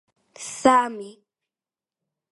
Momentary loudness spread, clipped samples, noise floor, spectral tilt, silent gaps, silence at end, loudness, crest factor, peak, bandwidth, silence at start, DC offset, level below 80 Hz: 20 LU; under 0.1%; under -90 dBFS; -3 dB/octave; none; 1.2 s; -20 LUFS; 24 dB; -2 dBFS; 11.5 kHz; 0.4 s; under 0.1%; -68 dBFS